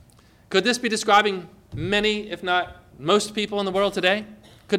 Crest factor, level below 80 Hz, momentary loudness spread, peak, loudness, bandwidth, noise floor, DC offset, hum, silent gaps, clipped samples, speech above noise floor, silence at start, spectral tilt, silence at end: 18 dB; -52 dBFS; 14 LU; -6 dBFS; -22 LUFS; 15.5 kHz; -54 dBFS; under 0.1%; none; none; under 0.1%; 31 dB; 0.5 s; -3.5 dB/octave; 0 s